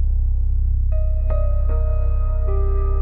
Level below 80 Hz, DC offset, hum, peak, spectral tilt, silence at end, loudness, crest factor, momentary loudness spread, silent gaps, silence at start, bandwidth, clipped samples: -18 dBFS; under 0.1%; none; -10 dBFS; -12 dB/octave; 0 s; -22 LUFS; 8 dB; 1 LU; none; 0 s; 2.7 kHz; under 0.1%